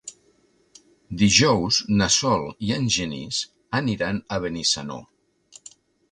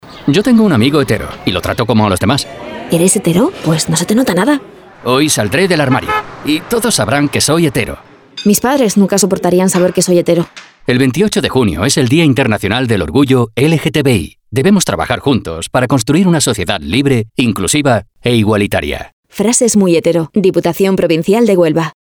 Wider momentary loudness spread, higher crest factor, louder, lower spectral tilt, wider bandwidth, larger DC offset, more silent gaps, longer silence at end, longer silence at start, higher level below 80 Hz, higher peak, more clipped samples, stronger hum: first, 11 LU vs 7 LU; first, 22 dB vs 12 dB; second, -22 LUFS vs -12 LUFS; second, -3.5 dB/octave vs -5 dB/octave; second, 11 kHz vs 20 kHz; neither; second, none vs 19.13-19.23 s; first, 1.1 s vs 0.15 s; about the same, 0.05 s vs 0.05 s; second, -48 dBFS vs -38 dBFS; about the same, -2 dBFS vs 0 dBFS; neither; neither